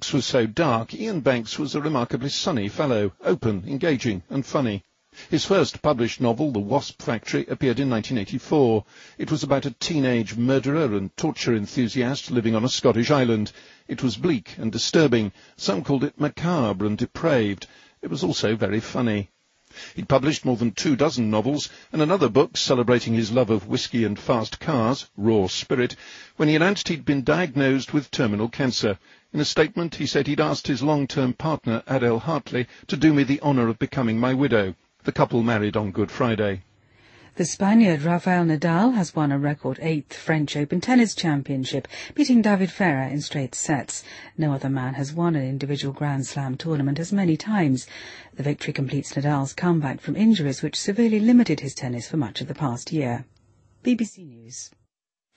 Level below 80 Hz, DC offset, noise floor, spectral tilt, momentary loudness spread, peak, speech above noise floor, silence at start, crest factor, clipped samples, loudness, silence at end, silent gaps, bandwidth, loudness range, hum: -56 dBFS; under 0.1%; -80 dBFS; -5.5 dB/octave; 9 LU; -4 dBFS; 58 dB; 0 s; 20 dB; under 0.1%; -23 LUFS; 0.7 s; none; 8.8 kHz; 3 LU; none